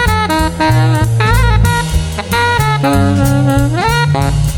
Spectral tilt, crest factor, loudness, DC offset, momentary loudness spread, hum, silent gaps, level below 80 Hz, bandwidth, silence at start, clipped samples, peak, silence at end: -5.5 dB/octave; 10 dB; -12 LUFS; under 0.1%; 3 LU; none; none; -20 dBFS; 19.5 kHz; 0 s; under 0.1%; 0 dBFS; 0 s